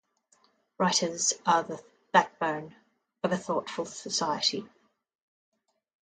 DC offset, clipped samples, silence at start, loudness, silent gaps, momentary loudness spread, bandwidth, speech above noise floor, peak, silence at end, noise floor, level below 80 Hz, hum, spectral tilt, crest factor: under 0.1%; under 0.1%; 0.8 s; -28 LUFS; none; 13 LU; 9.6 kHz; 39 dB; -6 dBFS; 1.35 s; -68 dBFS; -76 dBFS; none; -2.5 dB/octave; 24 dB